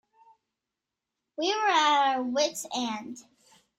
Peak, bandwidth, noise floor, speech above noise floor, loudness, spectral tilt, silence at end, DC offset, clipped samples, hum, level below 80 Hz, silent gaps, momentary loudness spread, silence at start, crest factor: -12 dBFS; 16 kHz; -88 dBFS; 61 dB; -26 LUFS; -1 dB/octave; 0.6 s; under 0.1%; under 0.1%; none; -78 dBFS; none; 21 LU; 1.4 s; 16 dB